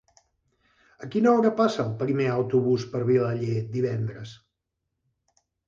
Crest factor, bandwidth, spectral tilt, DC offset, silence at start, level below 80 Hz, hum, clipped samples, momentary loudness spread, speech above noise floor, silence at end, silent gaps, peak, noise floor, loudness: 18 dB; 7.6 kHz; -8 dB/octave; under 0.1%; 1 s; -64 dBFS; none; under 0.1%; 12 LU; 58 dB; 1.3 s; none; -8 dBFS; -82 dBFS; -25 LUFS